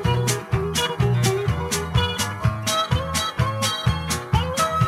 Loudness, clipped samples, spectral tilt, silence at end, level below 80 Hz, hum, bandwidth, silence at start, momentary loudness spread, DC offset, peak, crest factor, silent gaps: -22 LUFS; under 0.1%; -4 dB/octave; 0 s; -34 dBFS; none; 16 kHz; 0 s; 3 LU; under 0.1%; -6 dBFS; 16 dB; none